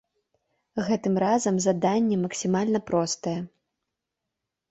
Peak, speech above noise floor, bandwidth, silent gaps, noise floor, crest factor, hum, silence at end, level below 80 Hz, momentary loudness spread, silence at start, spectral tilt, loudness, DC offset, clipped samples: -10 dBFS; 60 dB; 8.2 kHz; none; -85 dBFS; 16 dB; none; 1.25 s; -64 dBFS; 9 LU; 0.75 s; -5.5 dB/octave; -25 LUFS; under 0.1%; under 0.1%